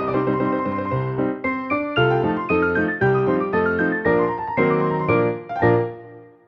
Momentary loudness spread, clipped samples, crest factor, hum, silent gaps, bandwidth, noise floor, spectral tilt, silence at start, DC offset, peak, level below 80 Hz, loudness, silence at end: 5 LU; under 0.1%; 16 dB; none; none; 6 kHz; -42 dBFS; -9.5 dB/octave; 0 s; under 0.1%; -4 dBFS; -52 dBFS; -21 LUFS; 0.2 s